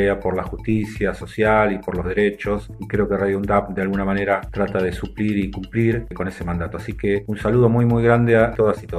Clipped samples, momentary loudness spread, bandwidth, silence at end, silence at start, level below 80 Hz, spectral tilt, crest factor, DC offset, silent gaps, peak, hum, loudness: under 0.1%; 10 LU; 12.5 kHz; 0 s; 0 s; -36 dBFS; -8.5 dB/octave; 18 dB; under 0.1%; none; -2 dBFS; none; -20 LUFS